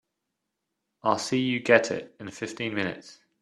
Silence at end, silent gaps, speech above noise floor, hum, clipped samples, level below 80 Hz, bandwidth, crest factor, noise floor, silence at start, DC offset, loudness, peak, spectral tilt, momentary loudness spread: 0.3 s; none; 56 dB; none; under 0.1%; -70 dBFS; 12.5 kHz; 26 dB; -83 dBFS; 1.05 s; under 0.1%; -26 LUFS; -4 dBFS; -4.5 dB/octave; 15 LU